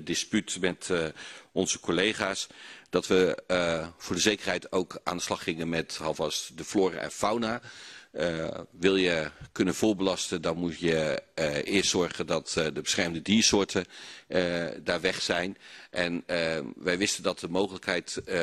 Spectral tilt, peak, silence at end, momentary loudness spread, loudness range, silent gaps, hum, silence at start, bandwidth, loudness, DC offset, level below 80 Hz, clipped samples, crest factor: -3.5 dB/octave; -8 dBFS; 0 s; 9 LU; 3 LU; none; none; 0 s; 13.5 kHz; -29 LUFS; under 0.1%; -58 dBFS; under 0.1%; 22 dB